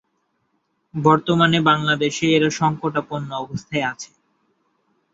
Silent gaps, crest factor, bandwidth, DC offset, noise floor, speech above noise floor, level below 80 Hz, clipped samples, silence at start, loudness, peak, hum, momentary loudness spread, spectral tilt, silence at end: none; 20 dB; 7.8 kHz; under 0.1%; -70 dBFS; 51 dB; -58 dBFS; under 0.1%; 0.95 s; -19 LUFS; -2 dBFS; none; 13 LU; -5 dB/octave; 1.1 s